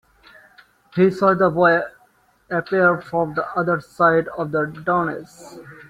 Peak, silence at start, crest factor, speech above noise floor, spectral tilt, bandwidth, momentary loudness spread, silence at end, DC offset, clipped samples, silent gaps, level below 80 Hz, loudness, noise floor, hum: -2 dBFS; 0.95 s; 18 dB; 39 dB; -7.5 dB/octave; 12 kHz; 15 LU; 0.15 s; under 0.1%; under 0.1%; none; -58 dBFS; -19 LUFS; -58 dBFS; none